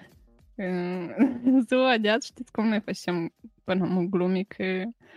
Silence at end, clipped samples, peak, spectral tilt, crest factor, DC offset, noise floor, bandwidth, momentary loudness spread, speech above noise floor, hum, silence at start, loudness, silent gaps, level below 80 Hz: 0.25 s; under 0.1%; -10 dBFS; -6 dB/octave; 16 dB; under 0.1%; -57 dBFS; 11.5 kHz; 12 LU; 31 dB; none; 0.6 s; -26 LUFS; none; -66 dBFS